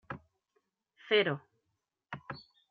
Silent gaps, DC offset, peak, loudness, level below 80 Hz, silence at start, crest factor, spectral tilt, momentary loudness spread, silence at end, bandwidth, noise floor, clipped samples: none; under 0.1%; -14 dBFS; -31 LUFS; -74 dBFS; 0.1 s; 24 dB; -2 dB/octave; 19 LU; 0.3 s; 4.9 kHz; -84 dBFS; under 0.1%